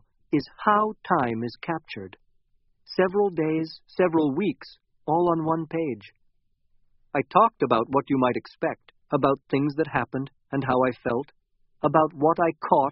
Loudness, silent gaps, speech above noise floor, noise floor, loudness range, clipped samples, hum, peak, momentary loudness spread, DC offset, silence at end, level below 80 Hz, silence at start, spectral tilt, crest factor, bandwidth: -25 LUFS; none; 42 dB; -66 dBFS; 2 LU; under 0.1%; none; -2 dBFS; 10 LU; under 0.1%; 0 s; -62 dBFS; 0.3 s; -5.5 dB/octave; 24 dB; 5.8 kHz